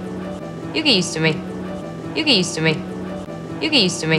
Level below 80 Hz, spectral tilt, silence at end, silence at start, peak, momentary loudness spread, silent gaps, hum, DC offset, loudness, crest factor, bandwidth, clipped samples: -50 dBFS; -4 dB/octave; 0 s; 0 s; 0 dBFS; 14 LU; none; none; under 0.1%; -19 LUFS; 20 dB; 12.5 kHz; under 0.1%